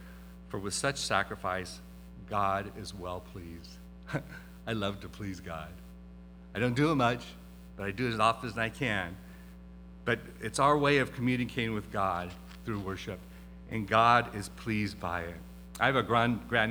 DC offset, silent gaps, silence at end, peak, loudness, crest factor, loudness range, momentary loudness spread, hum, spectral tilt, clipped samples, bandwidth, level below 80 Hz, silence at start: under 0.1%; none; 0 s; -8 dBFS; -31 LUFS; 24 dB; 8 LU; 23 LU; none; -5 dB/octave; under 0.1%; over 20 kHz; -52 dBFS; 0 s